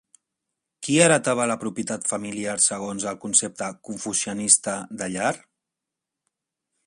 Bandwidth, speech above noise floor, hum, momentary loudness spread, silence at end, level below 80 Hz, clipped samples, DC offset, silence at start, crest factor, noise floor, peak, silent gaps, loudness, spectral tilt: 11.5 kHz; 62 dB; none; 13 LU; 1.5 s; -66 dBFS; under 0.1%; under 0.1%; 0.8 s; 24 dB; -86 dBFS; -2 dBFS; none; -22 LUFS; -3 dB/octave